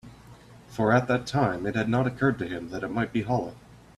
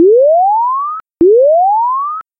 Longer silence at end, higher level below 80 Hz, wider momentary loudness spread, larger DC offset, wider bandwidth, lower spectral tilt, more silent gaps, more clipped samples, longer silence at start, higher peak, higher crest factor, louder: about the same, 0.2 s vs 0.2 s; about the same, -54 dBFS vs -50 dBFS; about the same, 10 LU vs 10 LU; neither; first, 12.5 kHz vs 2 kHz; second, -7 dB/octave vs -12.5 dB/octave; neither; neither; about the same, 0.05 s vs 0 s; second, -8 dBFS vs -2 dBFS; first, 18 dB vs 8 dB; second, -27 LUFS vs -10 LUFS